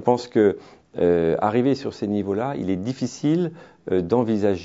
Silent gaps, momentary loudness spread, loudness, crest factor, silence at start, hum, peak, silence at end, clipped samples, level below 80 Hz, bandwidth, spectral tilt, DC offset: none; 8 LU; -22 LUFS; 18 dB; 0 s; none; -4 dBFS; 0 s; under 0.1%; -56 dBFS; 7.8 kHz; -7.5 dB/octave; under 0.1%